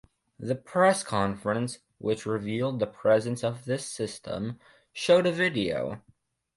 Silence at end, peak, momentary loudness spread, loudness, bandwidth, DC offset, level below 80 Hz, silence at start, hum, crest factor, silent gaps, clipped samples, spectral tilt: 0.6 s; -8 dBFS; 13 LU; -28 LUFS; 11.5 kHz; under 0.1%; -60 dBFS; 0.4 s; none; 20 dB; none; under 0.1%; -5 dB/octave